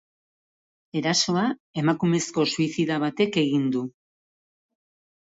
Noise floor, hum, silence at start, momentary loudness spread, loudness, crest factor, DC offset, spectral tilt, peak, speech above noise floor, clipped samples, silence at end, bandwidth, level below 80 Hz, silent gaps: under -90 dBFS; none; 0.95 s; 6 LU; -24 LUFS; 18 dB; under 0.1%; -4.5 dB/octave; -8 dBFS; over 66 dB; under 0.1%; 1.4 s; 8 kHz; -66 dBFS; 1.60-1.74 s